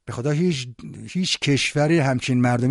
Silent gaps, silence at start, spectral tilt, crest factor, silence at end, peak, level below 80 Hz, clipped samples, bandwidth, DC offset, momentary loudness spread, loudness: none; 0.05 s; -5.5 dB/octave; 12 dB; 0 s; -8 dBFS; -54 dBFS; under 0.1%; 11.5 kHz; under 0.1%; 11 LU; -21 LUFS